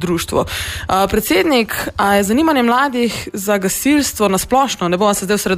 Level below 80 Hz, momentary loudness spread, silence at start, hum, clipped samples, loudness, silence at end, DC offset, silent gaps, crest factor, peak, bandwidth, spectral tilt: -38 dBFS; 5 LU; 0 s; none; under 0.1%; -15 LUFS; 0 s; under 0.1%; none; 14 dB; -2 dBFS; 15.5 kHz; -4 dB/octave